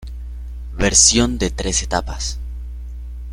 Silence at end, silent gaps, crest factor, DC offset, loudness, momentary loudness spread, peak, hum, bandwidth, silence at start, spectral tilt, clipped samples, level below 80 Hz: 0 s; none; 20 dB; under 0.1%; -16 LUFS; 22 LU; 0 dBFS; none; 14.5 kHz; 0 s; -2.5 dB/octave; under 0.1%; -28 dBFS